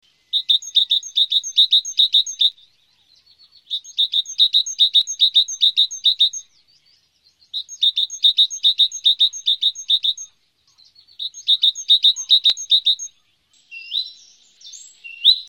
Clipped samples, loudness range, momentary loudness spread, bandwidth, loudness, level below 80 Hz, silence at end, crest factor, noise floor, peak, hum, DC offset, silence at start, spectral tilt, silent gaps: under 0.1%; 2 LU; 14 LU; 17 kHz; -15 LUFS; -78 dBFS; 0.05 s; 18 dB; -61 dBFS; -2 dBFS; none; under 0.1%; 0.35 s; 6 dB/octave; none